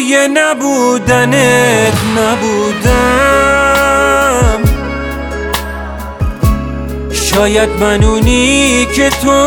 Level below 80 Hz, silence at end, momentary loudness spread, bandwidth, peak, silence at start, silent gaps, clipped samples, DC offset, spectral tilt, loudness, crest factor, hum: -20 dBFS; 0 s; 10 LU; 20 kHz; 0 dBFS; 0 s; none; under 0.1%; under 0.1%; -4.5 dB/octave; -10 LUFS; 10 dB; none